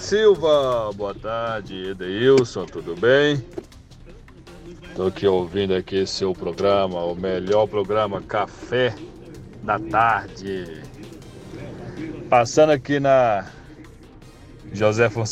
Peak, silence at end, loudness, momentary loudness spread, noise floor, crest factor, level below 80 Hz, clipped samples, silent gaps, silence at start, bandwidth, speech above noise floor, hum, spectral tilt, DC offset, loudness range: -4 dBFS; 0 s; -21 LUFS; 21 LU; -44 dBFS; 18 dB; -48 dBFS; under 0.1%; none; 0 s; 9.8 kHz; 24 dB; none; -5.5 dB/octave; under 0.1%; 4 LU